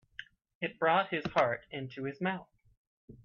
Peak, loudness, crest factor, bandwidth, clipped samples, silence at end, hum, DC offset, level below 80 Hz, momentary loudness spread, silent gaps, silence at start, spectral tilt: -14 dBFS; -33 LUFS; 20 dB; 7 kHz; under 0.1%; 0.1 s; none; under 0.1%; -68 dBFS; 14 LU; 0.55-0.61 s, 2.77-3.08 s; 0.2 s; -6.5 dB/octave